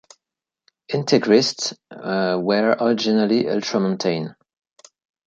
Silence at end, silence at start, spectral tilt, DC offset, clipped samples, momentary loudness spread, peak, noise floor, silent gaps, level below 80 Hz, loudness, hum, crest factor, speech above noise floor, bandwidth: 0.95 s; 0.9 s; -5 dB/octave; under 0.1%; under 0.1%; 11 LU; -2 dBFS; -87 dBFS; none; -66 dBFS; -20 LUFS; none; 18 dB; 67 dB; 8.8 kHz